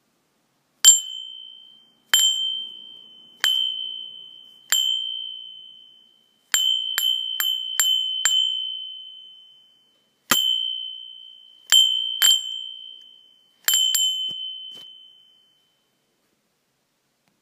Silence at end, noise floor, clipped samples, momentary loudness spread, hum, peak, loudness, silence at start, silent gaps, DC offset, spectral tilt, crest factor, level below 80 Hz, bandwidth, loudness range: 2.45 s; -71 dBFS; under 0.1%; 24 LU; none; 0 dBFS; -19 LUFS; 0.85 s; none; under 0.1%; 3.5 dB/octave; 26 dB; -78 dBFS; 15.5 kHz; 5 LU